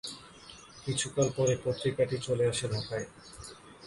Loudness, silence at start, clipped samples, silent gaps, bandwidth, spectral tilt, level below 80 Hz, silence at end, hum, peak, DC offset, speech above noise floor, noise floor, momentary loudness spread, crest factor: -31 LUFS; 0.05 s; under 0.1%; none; 11.5 kHz; -4.5 dB/octave; -58 dBFS; 0 s; none; -14 dBFS; under 0.1%; 21 dB; -52 dBFS; 18 LU; 18 dB